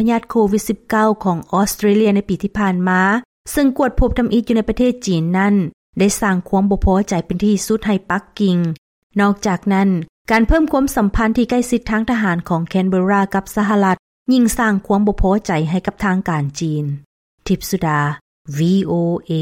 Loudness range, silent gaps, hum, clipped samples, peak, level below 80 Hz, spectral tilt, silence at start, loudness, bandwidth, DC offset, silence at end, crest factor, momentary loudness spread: 3 LU; 3.25-3.45 s, 5.73-5.93 s, 8.78-9.10 s, 10.09-10.25 s, 13.99-14.26 s, 17.05-17.38 s, 18.21-18.45 s; none; under 0.1%; -4 dBFS; -30 dBFS; -6 dB/octave; 0 s; -17 LUFS; 16.5 kHz; under 0.1%; 0 s; 12 dB; 6 LU